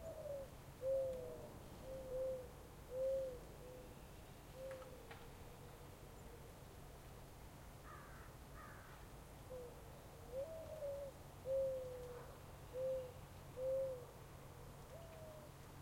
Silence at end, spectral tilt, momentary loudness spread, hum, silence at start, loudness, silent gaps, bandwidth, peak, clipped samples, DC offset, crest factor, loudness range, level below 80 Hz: 0 s; -5.5 dB/octave; 15 LU; none; 0 s; -50 LUFS; none; 16.5 kHz; -34 dBFS; under 0.1%; under 0.1%; 16 dB; 11 LU; -62 dBFS